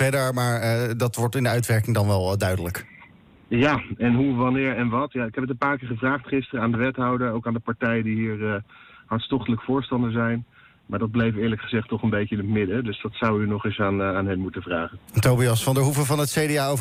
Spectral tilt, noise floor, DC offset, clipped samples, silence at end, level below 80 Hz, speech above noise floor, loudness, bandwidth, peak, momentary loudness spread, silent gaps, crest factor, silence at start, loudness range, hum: -6 dB/octave; -51 dBFS; under 0.1%; under 0.1%; 0 s; -52 dBFS; 28 dB; -24 LUFS; 16 kHz; -10 dBFS; 7 LU; none; 14 dB; 0 s; 3 LU; none